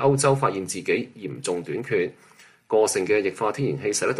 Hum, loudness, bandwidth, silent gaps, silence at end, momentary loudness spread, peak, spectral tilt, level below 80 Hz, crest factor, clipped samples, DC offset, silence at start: none; -24 LUFS; 12.5 kHz; none; 0 s; 8 LU; -8 dBFS; -4.5 dB/octave; -64 dBFS; 16 dB; under 0.1%; under 0.1%; 0 s